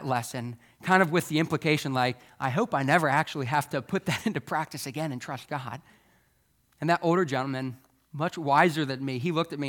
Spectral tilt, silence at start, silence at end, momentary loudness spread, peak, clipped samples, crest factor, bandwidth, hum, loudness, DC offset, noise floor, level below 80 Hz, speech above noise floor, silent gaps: -5.5 dB/octave; 0 s; 0 s; 13 LU; -6 dBFS; under 0.1%; 22 dB; 19 kHz; none; -27 LUFS; under 0.1%; -68 dBFS; -70 dBFS; 41 dB; none